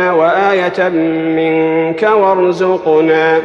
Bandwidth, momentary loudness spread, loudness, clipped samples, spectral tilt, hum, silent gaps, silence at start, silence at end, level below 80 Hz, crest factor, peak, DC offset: 7.2 kHz; 4 LU; -12 LUFS; under 0.1%; -7 dB/octave; none; none; 0 s; 0 s; -56 dBFS; 10 dB; 0 dBFS; under 0.1%